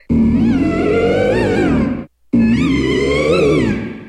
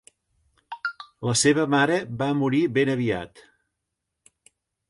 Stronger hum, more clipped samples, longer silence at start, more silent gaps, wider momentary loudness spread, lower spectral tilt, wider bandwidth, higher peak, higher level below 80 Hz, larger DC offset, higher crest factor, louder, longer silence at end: neither; neither; second, 0.1 s vs 0.7 s; neither; second, 5 LU vs 13 LU; first, -7 dB/octave vs -4.5 dB/octave; about the same, 10.5 kHz vs 11.5 kHz; first, -2 dBFS vs -6 dBFS; first, -30 dBFS vs -60 dBFS; neither; second, 12 dB vs 18 dB; first, -14 LUFS vs -23 LUFS; second, 0 s vs 1.5 s